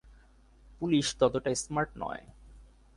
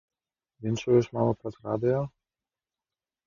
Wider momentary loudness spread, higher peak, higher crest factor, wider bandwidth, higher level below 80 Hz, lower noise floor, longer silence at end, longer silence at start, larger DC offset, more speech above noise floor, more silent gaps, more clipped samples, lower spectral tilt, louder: about the same, 12 LU vs 11 LU; about the same, -12 dBFS vs -10 dBFS; about the same, 22 dB vs 20 dB; first, 11.5 kHz vs 7.2 kHz; first, -54 dBFS vs -60 dBFS; second, -59 dBFS vs under -90 dBFS; second, 0.3 s vs 1.2 s; second, 0.05 s vs 0.6 s; neither; second, 29 dB vs over 63 dB; neither; neither; second, -4.5 dB/octave vs -7.5 dB/octave; about the same, -30 LUFS vs -28 LUFS